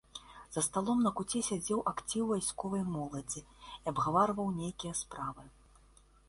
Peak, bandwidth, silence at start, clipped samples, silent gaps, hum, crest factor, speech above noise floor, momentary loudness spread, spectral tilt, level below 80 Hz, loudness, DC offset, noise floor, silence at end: -16 dBFS; 12 kHz; 0.15 s; under 0.1%; none; none; 20 dB; 28 dB; 12 LU; -4.5 dB/octave; -62 dBFS; -35 LUFS; under 0.1%; -63 dBFS; 0.8 s